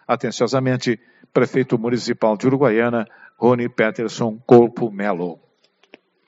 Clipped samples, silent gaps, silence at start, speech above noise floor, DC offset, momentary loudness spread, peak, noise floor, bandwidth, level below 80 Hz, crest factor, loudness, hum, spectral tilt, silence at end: under 0.1%; none; 0.1 s; 41 dB; under 0.1%; 11 LU; 0 dBFS; -60 dBFS; 8 kHz; -62 dBFS; 20 dB; -19 LUFS; none; -5.5 dB/octave; 0.95 s